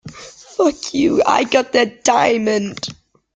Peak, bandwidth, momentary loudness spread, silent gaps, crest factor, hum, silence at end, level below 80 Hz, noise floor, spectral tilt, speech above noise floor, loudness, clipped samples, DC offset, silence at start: -2 dBFS; 9.6 kHz; 15 LU; none; 16 dB; none; 0.4 s; -54 dBFS; -38 dBFS; -3.5 dB/octave; 23 dB; -16 LUFS; under 0.1%; under 0.1%; 0.05 s